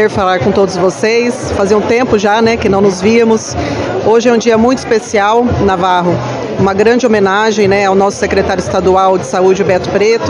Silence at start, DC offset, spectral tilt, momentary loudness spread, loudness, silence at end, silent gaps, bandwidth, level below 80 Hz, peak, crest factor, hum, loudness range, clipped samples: 0 s; under 0.1%; -5.5 dB/octave; 5 LU; -10 LUFS; 0 s; none; 11 kHz; -40 dBFS; 0 dBFS; 10 dB; none; 1 LU; 0.7%